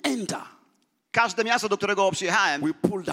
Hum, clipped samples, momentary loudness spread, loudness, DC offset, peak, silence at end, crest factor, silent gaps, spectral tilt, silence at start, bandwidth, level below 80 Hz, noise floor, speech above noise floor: none; under 0.1%; 7 LU; -24 LUFS; under 0.1%; -6 dBFS; 0 s; 20 dB; none; -3.5 dB/octave; 0.05 s; 16 kHz; -68 dBFS; -68 dBFS; 44 dB